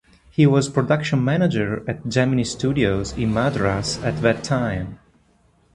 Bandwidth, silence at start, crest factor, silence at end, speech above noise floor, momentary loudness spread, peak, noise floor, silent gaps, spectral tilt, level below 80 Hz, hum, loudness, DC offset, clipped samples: 11.5 kHz; 0.4 s; 18 dB; 0.8 s; 39 dB; 8 LU; -2 dBFS; -59 dBFS; none; -6 dB/octave; -42 dBFS; none; -21 LUFS; under 0.1%; under 0.1%